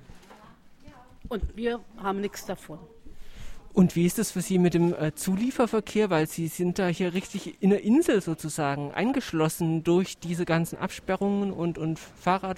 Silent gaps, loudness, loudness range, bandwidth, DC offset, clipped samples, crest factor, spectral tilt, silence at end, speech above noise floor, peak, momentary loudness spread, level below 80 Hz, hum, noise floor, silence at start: none; -27 LUFS; 5 LU; 16 kHz; under 0.1%; under 0.1%; 18 dB; -6 dB/octave; 0 s; 25 dB; -8 dBFS; 11 LU; -48 dBFS; none; -51 dBFS; 0.1 s